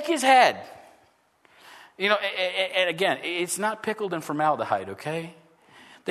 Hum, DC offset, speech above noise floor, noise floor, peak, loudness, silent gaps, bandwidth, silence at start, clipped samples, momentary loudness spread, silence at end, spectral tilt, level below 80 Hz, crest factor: none; under 0.1%; 38 dB; -62 dBFS; -4 dBFS; -24 LUFS; none; 13.5 kHz; 0 s; under 0.1%; 15 LU; 0 s; -3 dB/octave; -78 dBFS; 22 dB